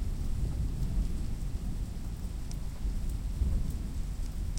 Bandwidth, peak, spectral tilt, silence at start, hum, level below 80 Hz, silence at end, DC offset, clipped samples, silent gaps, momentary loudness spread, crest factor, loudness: 16.5 kHz; -18 dBFS; -6.5 dB/octave; 0 s; none; -34 dBFS; 0 s; under 0.1%; under 0.1%; none; 6 LU; 14 dB; -37 LUFS